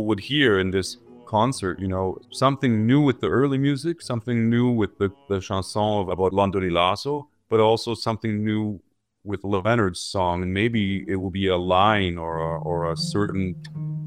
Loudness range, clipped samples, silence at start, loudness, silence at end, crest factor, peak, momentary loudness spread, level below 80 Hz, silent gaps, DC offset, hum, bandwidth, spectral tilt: 2 LU; under 0.1%; 0 s; -23 LUFS; 0 s; 20 dB; -4 dBFS; 10 LU; -54 dBFS; none; under 0.1%; none; 14.5 kHz; -6 dB/octave